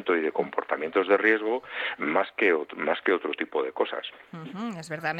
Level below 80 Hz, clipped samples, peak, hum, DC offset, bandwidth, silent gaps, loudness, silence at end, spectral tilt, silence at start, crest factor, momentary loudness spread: -74 dBFS; under 0.1%; -8 dBFS; none; under 0.1%; 10 kHz; none; -27 LUFS; 0 s; -5.5 dB/octave; 0 s; 20 dB; 13 LU